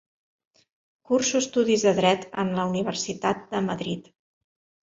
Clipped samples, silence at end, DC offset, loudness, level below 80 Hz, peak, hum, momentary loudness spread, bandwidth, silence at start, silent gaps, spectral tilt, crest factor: under 0.1%; 0.85 s; under 0.1%; -25 LUFS; -64 dBFS; -8 dBFS; none; 8 LU; 8 kHz; 1.1 s; none; -4 dB/octave; 20 dB